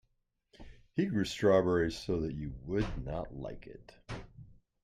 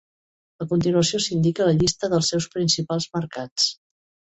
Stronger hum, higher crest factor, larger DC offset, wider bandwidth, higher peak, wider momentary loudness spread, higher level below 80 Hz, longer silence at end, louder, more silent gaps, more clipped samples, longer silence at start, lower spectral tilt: neither; about the same, 20 dB vs 16 dB; neither; first, 14.5 kHz vs 8.2 kHz; second, -14 dBFS vs -8 dBFS; first, 19 LU vs 8 LU; about the same, -50 dBFS vs -52 dBFS; second, 0.3 s vs 0.6 s; second, -33 LUFS vs -22 LUFS; second, none vs 3.51-3.56 s; neither; about the same, 0.6 s vs 0.6 s; first, -6.5 dB/octave vs -4.5 dB/octave